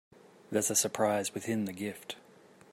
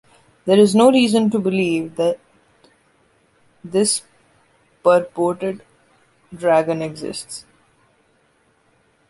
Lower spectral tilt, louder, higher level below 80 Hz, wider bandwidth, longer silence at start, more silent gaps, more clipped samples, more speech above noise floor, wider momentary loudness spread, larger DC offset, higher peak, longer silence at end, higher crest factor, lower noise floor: second, -3 dB/octave vs -4.5 dB/octave; second, -31 LUFS vs -18 LUFS; second, -78 dBFS vs -62 dBFS; first, 16 kHz vs 11.5 kHz; about the same, 0.5 s vs 0.45 s; neither; neither; second, 26 dB vs 43 dB; about the same, 16 LU vs 17 LU; neither; second, -14 dBFS vs -2 dBFS; second, 0.55 s vs 1.7 s; about the same, 20 dB vs 18 dB; about the same, -58 dBFS vs -60 dBFS